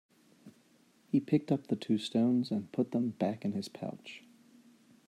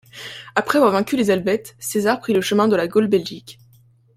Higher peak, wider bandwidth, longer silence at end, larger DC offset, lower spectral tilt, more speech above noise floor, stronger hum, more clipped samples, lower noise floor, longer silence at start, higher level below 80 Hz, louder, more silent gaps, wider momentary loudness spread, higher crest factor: second, -14 dBFS vs -2 dBFS; second, 12.5 kHz vs 16 kHz; first, 0.9 s vs 0.65 s; neither; first, -7 dB/octave vs -5 dB/octave; about the same, 34 dB vs 35 dB; neither; neither; first, -66 dBFS vs -53 dBFS; first, 0.45 s vs 0.15 s; second, -80 dBFS vs -60 dBFS; second, -33 LUFS vs -19 LUFS; neither; about the same, 13 LU vs 14 LU; about the same, 20 dB vs 18 dB